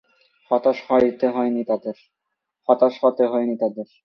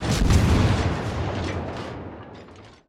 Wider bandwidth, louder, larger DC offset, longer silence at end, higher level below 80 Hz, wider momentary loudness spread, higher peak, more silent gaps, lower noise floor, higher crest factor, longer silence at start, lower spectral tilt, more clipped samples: second, 6.2 kHz vs 14.5 kHz; about the same, -21 LUFS vs -23 LUFS; neither; about the same, 0.2 s vs 0.2 s; second, -64 dBFS vs -30 dBFS; second, 8 LU vs 21 LU; first, -2 dBFS vs -8 dBFS; neither; first, -79 dBFS vs -45 dBFS; about the same, 20 dB vs 16 dB; first, 0.5 s vs 0 s; first, -8 dB/octave vs -6 dB/octave; neither